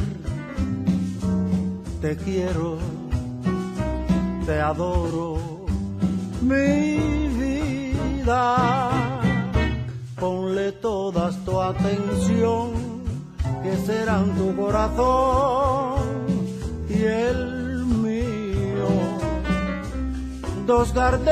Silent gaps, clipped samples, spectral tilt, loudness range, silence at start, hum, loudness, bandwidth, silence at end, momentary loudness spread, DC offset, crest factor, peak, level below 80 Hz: none; under 0.1%; -7 dB/octave; 3 LU; 0 s; none; -24 LUFS; 13 kHz; 0 s; 9 LU; under 0.1%; 16 dB; -6 dBFS; -34 dBFS